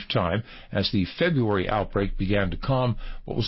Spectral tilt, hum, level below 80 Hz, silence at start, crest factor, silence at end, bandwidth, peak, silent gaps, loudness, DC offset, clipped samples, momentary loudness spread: -10.5 dB/octave; none; -38 dBFS; 0 s; 14 dB; 0 s; 5.8 kHz; -12 dBFS; none; -26 LUFS; under 0.1%; under 0.1%; 7 LU